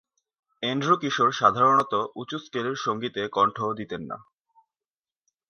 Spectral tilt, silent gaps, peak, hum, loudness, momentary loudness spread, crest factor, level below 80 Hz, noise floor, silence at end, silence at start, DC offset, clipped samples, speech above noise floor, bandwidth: -5 dB/octave; none; -4 dBFS; none; -24 LUFS; 14 LU; 22 dB; -66 dBFS; under -90 dBFS; 1.3 s; 0.6 s; under 0.1%; under 0.1%; over 65 dB; 9.6 kHz